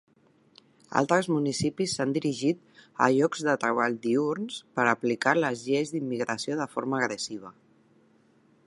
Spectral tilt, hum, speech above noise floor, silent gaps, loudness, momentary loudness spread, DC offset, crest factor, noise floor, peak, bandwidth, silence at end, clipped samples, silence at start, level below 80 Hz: -5 dB/octave; none; 36 dB; none; -27 LUFS; 7 LU; under 0.1%; 22 dB; -63 dBFS; -6 dBFS; 11.5 kHz; 1.15 s; under 0.1%; 0.9 s; -68 dBFS